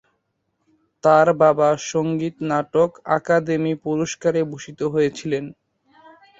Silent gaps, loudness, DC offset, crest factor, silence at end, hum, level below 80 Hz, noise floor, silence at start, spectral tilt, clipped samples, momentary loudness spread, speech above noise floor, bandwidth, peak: none; -20 LUFS; under 0.1%; 18 dB; 0.9 s; none; -62 dBFS; -72 dBFS; 1.05 s; -6 dB/octave; under 0.1%; 11 LU; 53 dB; 8 kHz; -2 dBFS